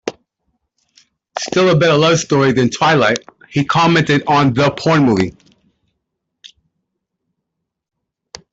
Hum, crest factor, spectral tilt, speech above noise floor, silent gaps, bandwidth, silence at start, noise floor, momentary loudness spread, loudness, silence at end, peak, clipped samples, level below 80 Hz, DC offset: none; 14 dB; -5.5 dB/octave; 66 dB; none; 8 kHz; 0.05 s; -78 dBFS; 11 LU; -14 LUFS; 2.05 s; -2 dBFS; under 0.1%; -50 dBFS; under 0.1%